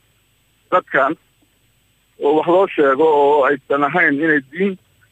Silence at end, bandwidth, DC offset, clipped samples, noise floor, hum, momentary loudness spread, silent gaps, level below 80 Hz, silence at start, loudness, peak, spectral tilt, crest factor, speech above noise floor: 0.35 s; 8.4 kHz; under 0.1%; under 0.1%; -59 dBFS; none; 9 LU; none; -66 dBFS; 0.7 s; -16 LUFS; -2 dBFS; -7 dB/octave; 16 dB; 44 dB